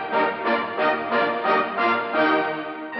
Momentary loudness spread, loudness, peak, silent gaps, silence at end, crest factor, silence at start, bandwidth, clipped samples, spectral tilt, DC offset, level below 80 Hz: 3 LU; -22 LUFS; -8 dBFS; none; 0 s; 14 dB; 0 s; 5.8 kHz; under 0.1%; -1.5 dB/octave; under 0.1%; -68 dBFS